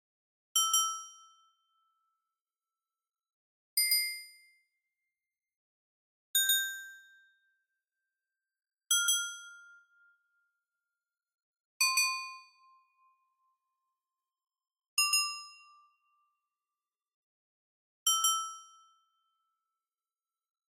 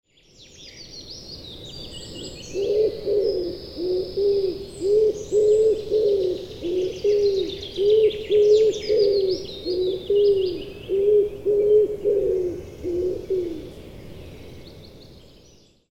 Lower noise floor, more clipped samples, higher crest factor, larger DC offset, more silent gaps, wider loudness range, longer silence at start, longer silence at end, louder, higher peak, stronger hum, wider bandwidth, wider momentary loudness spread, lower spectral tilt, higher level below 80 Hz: first, under -90 dBFS vs -53 dBFS; neither; first, 24 dB vs 14 dB; second, under 0.1% vs 0.2%; first, 2.41-2.45 s, 3.33-3.77 s, 5.56-6.34 s, 11.42-11.53 s, 11.60-11.80 s, 14.88-14.97 s, 17.14-18.06 s vs none; second, 2 LU vs 7 LU; first, 0.55 s vs 0.4 s; first, 2.05 s vs 0.7 s; second, -29 LUFS vs -22 LUFS; second, -14 dBFS vs -8 dBFS; neither; first, 15.5 kHz vs 8.6 kHz; about the same, 19 LU vs 20 LU; second, 12 dB/octave vs -5.5 dB/octave; second, under -90 dBFS vs -48 dBFS